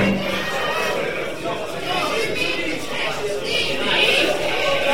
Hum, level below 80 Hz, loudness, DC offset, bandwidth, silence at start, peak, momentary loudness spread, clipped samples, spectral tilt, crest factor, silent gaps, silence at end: none; -48 dBFS; -21 LUFS; 3%; 16.5 kHz; 0 s; -4 dBFS; 9 LU; under 0.1%; -3.5 dB/octave; 18 dB; none; 0 s